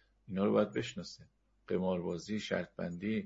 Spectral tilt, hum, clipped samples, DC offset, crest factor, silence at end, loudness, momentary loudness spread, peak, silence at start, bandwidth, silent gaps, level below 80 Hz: -5.5 dB/octave; none; under 0.1%; under 0.1%; 20 dB; 0 s; -36 LUFS; 13 LU; -16 dBFS; 0.3 s; 7.6 kHz; none; -70 dBFS